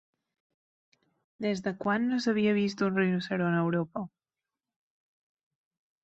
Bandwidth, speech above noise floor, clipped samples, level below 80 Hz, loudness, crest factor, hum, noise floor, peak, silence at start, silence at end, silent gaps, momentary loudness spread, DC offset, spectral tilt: 8 kHz; over 62 dB; under 0.1%; -72 dBFS; -29 LUFS; 18 dB; none; under -90 dBFS; -14 dBFS; 1.4 s; 1.95 s; none; 9 LU; under 0.1%; -7 dB/octave